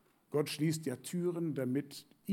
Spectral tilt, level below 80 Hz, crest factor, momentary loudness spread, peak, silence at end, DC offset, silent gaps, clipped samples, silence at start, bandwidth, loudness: -6 dB/octave; -86 dBFS; 16 dB; 6 LU; -20 dBFS; 0 s; under 0.1%; none; under 0.1%; 0.3 s; 17 kHz; -36 LUFS